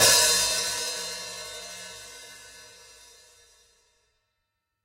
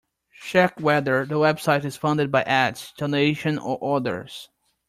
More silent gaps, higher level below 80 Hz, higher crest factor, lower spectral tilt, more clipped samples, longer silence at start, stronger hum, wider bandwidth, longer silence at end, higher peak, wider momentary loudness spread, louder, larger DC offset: neither; about the same, -58 dBFS vs -62 dBFS; first, 24 dB vs 18 dB; second, 1 dB/octave vs -6 dB/octave; neither; second, 0 s vs 0.4 s; neither; about the same, 16 kHz vs 15 kHz; first, 2.2 s vs 0.45 s; about the same, -6 dBFS vs -6 dBFS; first, 26 LU vs 10 LU; about the same, -23 LUFS vs -22 LUFS; neither